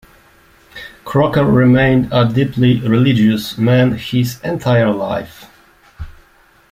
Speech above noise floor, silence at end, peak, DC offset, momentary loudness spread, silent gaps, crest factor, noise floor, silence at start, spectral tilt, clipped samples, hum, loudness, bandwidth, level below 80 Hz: 37 dB; 0.6 s; -2 dBFS; under 0.1%; 22 LU; none; 14 dB; -50 dBFS; 0.75 s; -7.5 dB/octave; under 0.1%; none; -14 LUFS; 16 kHz; -40 dBFS